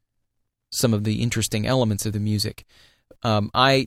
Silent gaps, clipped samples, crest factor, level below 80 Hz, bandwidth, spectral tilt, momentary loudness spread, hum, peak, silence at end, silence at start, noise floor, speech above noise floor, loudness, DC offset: none; under 0.1%; 20 dB; -48 dBFS; 15.5 kHz; -4.5 dB/octave; 7 LU; none; -2 dBFS; 0 s; 0.7 s; -75 dBFS; 53 dB; -23 LUFS; under 0.1%